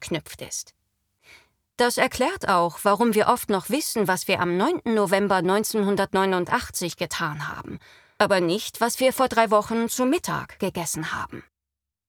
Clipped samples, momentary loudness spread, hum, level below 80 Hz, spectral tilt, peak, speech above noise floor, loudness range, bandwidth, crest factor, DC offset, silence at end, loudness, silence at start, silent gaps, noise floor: under 0.1%; 12 LU; none; -56 dBFS; -4 dB/octave; -4 dBFS; 64 dB; 2 LU; over 20 kHz; 20 dB; under 0.1%; 0.7 s; -23 LUFS; 0 s; none; -87 dBFS